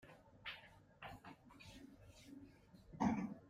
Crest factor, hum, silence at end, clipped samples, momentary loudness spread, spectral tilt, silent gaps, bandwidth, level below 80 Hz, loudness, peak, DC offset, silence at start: 24 dB; none; 0 s; under 0.1%; 23 LU; -6 dB/octave; none; 15 kHz; -70 dBFS; -47 LUFS; -26 dBFS; under 0.1%; 0.05 s